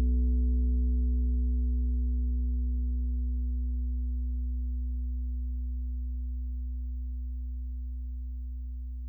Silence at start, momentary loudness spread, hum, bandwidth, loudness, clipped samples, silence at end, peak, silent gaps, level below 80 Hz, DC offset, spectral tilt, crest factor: 0 s; 10 LU; 60 Hz at -85 dBFS; 0.5 kHz; -33 LUFS; under 0.1%; 0 s; -20 dBFS; none; -30 dBFS; under 0.1%; -14 dB/octave; 10 dB